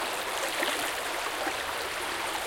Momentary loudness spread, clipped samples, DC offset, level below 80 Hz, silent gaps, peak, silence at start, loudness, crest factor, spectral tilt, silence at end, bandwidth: 3 LU; under 0.1%; under 0.1%; -60 dBFS; none; -14 dBFS; 0 s; -30 LUFS; 18 dB; -0.5 dB/octave; 0 s; 17 kHz